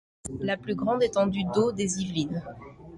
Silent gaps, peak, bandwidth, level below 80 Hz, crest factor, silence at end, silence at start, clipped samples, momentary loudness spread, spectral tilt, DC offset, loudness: none; -12 dBFS; 11.5 kHz; -54 dBFS; 16 dB; 0 s; 0.25 s; under 0.1%; 13 LU; -5 dB/octave; under 0.1%; -27 LUFS